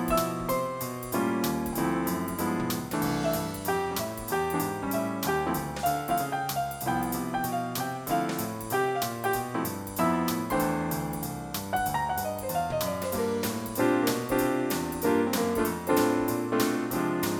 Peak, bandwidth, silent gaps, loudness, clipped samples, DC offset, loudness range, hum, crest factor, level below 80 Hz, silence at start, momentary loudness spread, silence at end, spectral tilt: -12 dBFS; 19 kHz; none; -29 LUFS; under 0.1%; under 0.1%; 3 LU; none; 16 dB; -52 dBFS; 0 s; 5 LU; 0 s; -5 dB/octave